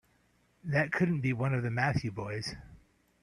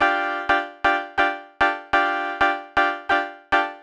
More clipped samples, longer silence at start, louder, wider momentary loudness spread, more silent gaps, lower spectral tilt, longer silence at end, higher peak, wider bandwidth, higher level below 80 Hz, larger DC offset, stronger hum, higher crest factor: neither; first, 0.65 s vs 0 s; second, -32 LUFS vs -22 LUFS; first, 11 LU vs 3 LU; neither; first, -7 dB/octave vs -3.5 dB/octave; first, 0.45 s vs 0 s; second, -12 dBFS vs -6 dBFS; about the same, 10.5 kHz vs 10 kHz; second, -60 dBFS vs -50 dBFS; neither; neither; about the same, 20 dB vs 16 dB